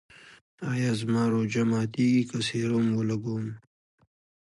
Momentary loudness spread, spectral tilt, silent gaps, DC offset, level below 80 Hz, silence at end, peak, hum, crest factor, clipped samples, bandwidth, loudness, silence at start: 10 LU; -6.5 dB/octave; 0.41-0.58 s; under 0.1%; -66 dBFS; 1 s; -14 dBFS; none; 14 dB; under 0.1%; 11.5 kHz; -27 LUFS; 0.25 s